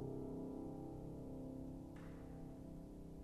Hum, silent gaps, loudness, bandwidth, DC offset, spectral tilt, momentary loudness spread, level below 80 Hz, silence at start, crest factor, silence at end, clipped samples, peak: none; none; -52 LUFS; 13 kHz; under 0.1%; -9 dB/octave; 6 LU; -60 dBFS; 0 s; 14 dB; 0 s; under 0.1%; -36 dBFS